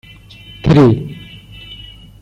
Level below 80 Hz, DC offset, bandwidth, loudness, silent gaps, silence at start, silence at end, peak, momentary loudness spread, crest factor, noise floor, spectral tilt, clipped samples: -36 dBFS; under 0.1%; 8.4 kHz; -12 LUFS; none; 0.65 s; 0.45 s; -2 dBFS; 25 LU; 14 dB; -38 dBFS; -8.5 dB/octave; under 0.1%